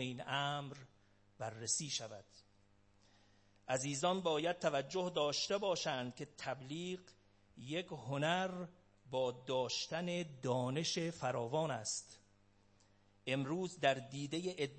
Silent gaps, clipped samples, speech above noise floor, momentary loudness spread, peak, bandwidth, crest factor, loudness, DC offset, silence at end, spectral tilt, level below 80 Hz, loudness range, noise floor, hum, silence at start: none; under 0.1%; 30 dB; 12 LU; -20 dBFS; 8.4 kHz; 22 dB; -39 LUFS; under 0.1%; 0 s; -3.5 dB/octave; -78 dBFS; 5 LU; -70 dBFS; none; 0 s